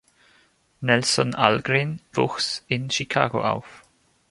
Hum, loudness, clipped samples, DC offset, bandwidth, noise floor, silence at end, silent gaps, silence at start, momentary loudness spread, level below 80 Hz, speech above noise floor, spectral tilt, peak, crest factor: none; -23 LUFS; under 0.1%; under 0.1%; 11.5 kHz; -61 dBFS; 0.55 s; none; 0.8 s; 7 LU; -58 dBFS; 38 dB; -4 dB/octave; 0 dBFS; 24 dB